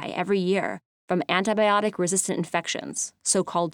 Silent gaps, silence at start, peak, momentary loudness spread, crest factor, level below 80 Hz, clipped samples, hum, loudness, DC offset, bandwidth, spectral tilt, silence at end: 0.85-1.08 s; 0 s; -6 dBFS; 8 LU; 20 dB; -72 dBFS; under 0.1%; none; -25 LUFS; under 0.1%; 18.5 kHz; -3.5 dB/octave; 0 s